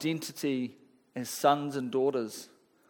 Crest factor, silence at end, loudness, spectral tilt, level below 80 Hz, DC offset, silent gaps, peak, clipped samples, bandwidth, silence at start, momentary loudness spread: 22 dB; 0.45 s; -31 LUFS; -4.5 dB/octave; -84 dBFS; under 0.1%; none; -10 dBFS; under 0.1%; 19 kHz; 0 s; 13 LU